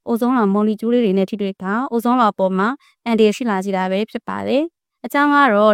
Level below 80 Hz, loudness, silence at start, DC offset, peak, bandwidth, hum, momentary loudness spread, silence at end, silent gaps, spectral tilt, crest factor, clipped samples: -66 dBFS; -18 LUFS; 0.05 s; under 0.1%; -2 dBFS; 16 kHz; none; 9 LU; 0 s; none; -6.5 dB/octave; 16 dB; under 0.1%